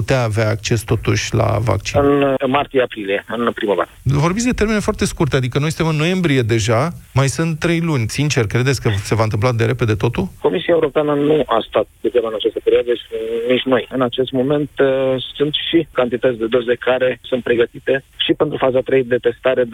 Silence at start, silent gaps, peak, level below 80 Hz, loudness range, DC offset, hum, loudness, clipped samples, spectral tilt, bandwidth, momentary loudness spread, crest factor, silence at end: 0 s; none; -4 dBFS; -40 dBFS; 1 LU; under 0.1%; none; -17 LUFS; under 0.1%; -5.5 dB/octave; 16 kHz; 4 LU; 12 dB; 0 s